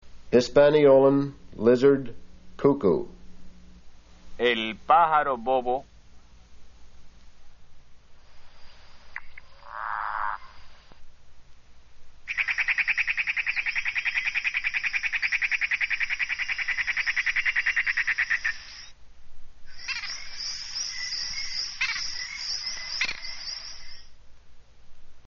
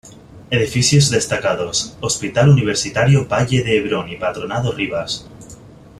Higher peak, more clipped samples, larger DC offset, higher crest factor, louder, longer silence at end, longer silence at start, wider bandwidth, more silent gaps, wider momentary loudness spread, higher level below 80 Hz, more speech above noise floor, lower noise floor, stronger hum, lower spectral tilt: second, -6 dBFS vs -2 dBFS; neither; neither; about the same, 20 dB vs 16 dB; second, -25 LUFS vs -17 LUFS; second, 0 s vs 0.3 s; about the same, 0.05 s vs 0.05 s; second, 7.2 kHz vs 13 kHz; neither; first, 16 LU vs 9 LU; second, -50 dBFS vs -44 dBFS; first, 27 dB vs 23 dB; first, -48 dBFS vs -40 dBFS; neither; second, -2 dB/octave vs -4.5 dB/octave